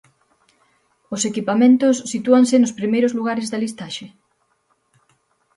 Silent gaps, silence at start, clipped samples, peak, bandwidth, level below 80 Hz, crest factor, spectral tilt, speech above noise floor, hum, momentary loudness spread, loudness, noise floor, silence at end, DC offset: none; 1.1 s; under 0.1%; -2 dBFS; 11.5 kHz; -68 dBFS; 18 dB; -4.5 dB/octave; 49 dB; none; 16 LU; -18 LUFS; -66 dBFS; 1.5 s; under 0.1%